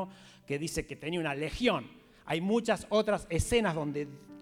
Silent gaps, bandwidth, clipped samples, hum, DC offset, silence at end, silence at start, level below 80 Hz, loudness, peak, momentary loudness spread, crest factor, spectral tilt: none; 16.5 kHz; under 0.1%; none; under 0.1%; 0 s; 0 s; -48 dBFS; -32 LUFS; -14 dBFS; 10 LU; 18 dB; -5 dB/octave